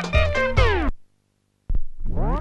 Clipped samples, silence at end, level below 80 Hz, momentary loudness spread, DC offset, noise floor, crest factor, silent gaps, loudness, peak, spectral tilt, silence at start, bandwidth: under 0.1%; 0 s; -26 dBFS; 13 LU; under 0.1%; -68 dBFS; 18 dB; none; -23 LUFS; -2 dBFS; -6 dB/octave; 0 s; 8.2 kHz